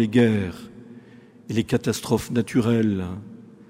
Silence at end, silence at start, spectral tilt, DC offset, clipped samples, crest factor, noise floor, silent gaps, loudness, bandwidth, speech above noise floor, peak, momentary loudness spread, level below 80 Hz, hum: 0.3 s; 0 s; -6.5 dB/octave; under 0.1%; under 0.1%; 18 dB; -48 dBFS; none; -23 LUFS; 16 kHz; 26 dB; -6 dBFS; 21 LU; -54 dBFS; none